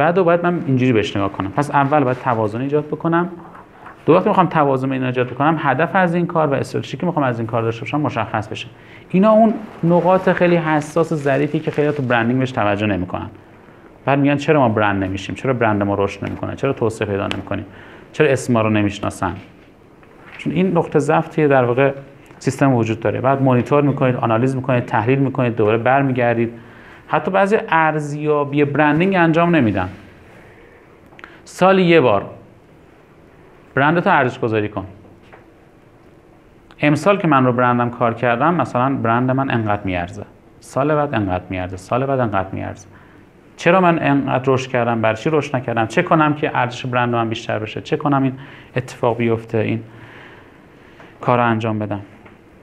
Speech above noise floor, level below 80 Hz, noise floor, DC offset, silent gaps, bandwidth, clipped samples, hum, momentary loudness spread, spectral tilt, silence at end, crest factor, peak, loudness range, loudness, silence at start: 30 dB; -54 dBFS; -47 dBFS; under 0.1%; none; 12 kHz; under 0.1%; none; 11 LU; -7 dB/octave; 0.55 s; 18 dB; 0 dBFS; 4 LU; -17 LUFS; 0 s